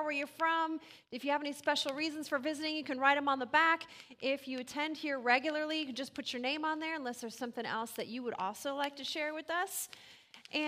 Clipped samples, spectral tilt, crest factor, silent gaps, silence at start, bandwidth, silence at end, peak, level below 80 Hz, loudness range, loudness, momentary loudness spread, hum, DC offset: under 0.1%; -2 dB/octave; 22 dB; none; 0 s; 15.5 kHz; 0 s; -14 dBFS; -84 dBFS; 6 LU; -35 LUFS; 11 LU; none; under 0.1%